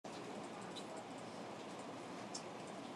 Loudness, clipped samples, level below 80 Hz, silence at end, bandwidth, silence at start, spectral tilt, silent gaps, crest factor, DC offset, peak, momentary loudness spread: -49 LUFS; under 0.1%; -88 dBFS; 0 s; 13 kHz; 0.05 s; -4 dB/octave; none; 18 dB; under 0.1%; -30 dBFS; 2 LU